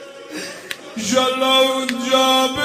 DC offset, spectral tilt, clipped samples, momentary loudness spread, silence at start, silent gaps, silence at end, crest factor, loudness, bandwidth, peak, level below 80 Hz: under 0.1%; -2 dB/octave; under 0.1%; 16 LU; 0 s; none; 0 s; 18 dB; -16 LUFS; 16 kHz; 0 dBFS; -60 dBFS